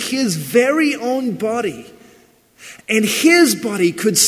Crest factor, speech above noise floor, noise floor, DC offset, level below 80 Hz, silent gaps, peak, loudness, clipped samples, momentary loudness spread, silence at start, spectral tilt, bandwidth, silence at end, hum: 16 dB; 34 dB; -51 dBFS; under 0.1%; -62 dBFS; none; 0 dBFS; -16 LUFS; under 0.1%; 11 LU; 0 s; -3 dB/octave; 16 kHz; 0 s; none